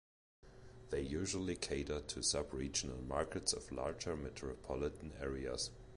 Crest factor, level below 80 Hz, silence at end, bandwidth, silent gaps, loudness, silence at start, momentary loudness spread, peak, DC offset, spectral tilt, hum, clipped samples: 22 dB; -54 dBFS; 0 s; 11 kHz; none; -41 LUFS; 0.45 s; 7 LU; -22 dBFS; under 0.1%; -3.5 dB/octave; none; under 0.1%